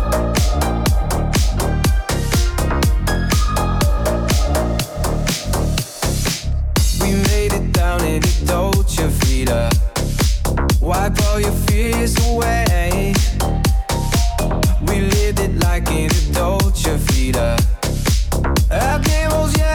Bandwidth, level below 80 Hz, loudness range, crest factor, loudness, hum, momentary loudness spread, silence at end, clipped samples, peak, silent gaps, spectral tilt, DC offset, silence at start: 19 kHz; -18 dBFS; 2 LU; 10 dB; -18 LUFS; none; 3 LU; 0 s; under 0.1%; -4 dBFS; none; -5 dB/octave; under 0.1%; 0 s